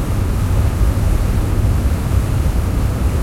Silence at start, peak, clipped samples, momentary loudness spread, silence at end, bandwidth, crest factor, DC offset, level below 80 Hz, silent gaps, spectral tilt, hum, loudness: 0 s; -4 dBFS; under 0.1%; 2 LU; 0 s; 16 kHz; 12 dB; under 0.1%; -18 dBFS; none; -7 dB/octave; none; -18 LUFS